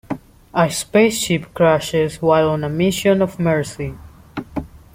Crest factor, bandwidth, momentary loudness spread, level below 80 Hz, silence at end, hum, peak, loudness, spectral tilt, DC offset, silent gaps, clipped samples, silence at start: 16 dB; 16.5 kHz; 15 LU; -44 dBFS; 0.15 s; none; -2 dBFS; -17 LUFS; -5 dB/octave; under 0.1%; none; under 0.1%; 0.1 s